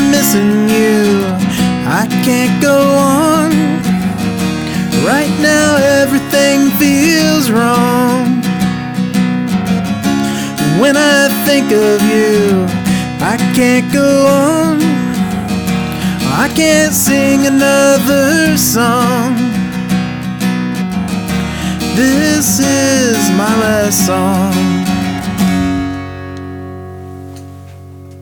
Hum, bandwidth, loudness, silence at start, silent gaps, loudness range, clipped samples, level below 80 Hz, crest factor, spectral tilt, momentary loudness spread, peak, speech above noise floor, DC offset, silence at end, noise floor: none; 19.5 kHz; -11 LUFS; 0 s; none; 4 LU; under 0.1%; -38 dBFS; 12 dB; -4.5 dB/octave; 8 LU; 0 dBFS; 21 dB; under 0.1%; 0 s; -31 dBFS